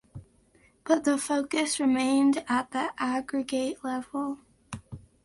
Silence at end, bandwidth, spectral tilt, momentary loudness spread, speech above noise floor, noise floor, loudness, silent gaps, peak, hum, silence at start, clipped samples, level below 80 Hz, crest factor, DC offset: 0.25 s; 11.5 kHz; -3.5 dB/octave; 18 LU; 36 dB; -62 dBFS; -27 LUFS; none; -12 dBFS; none; 0.15 s; under 0.1%; -62 dBFS; 18 dB; under 0.1%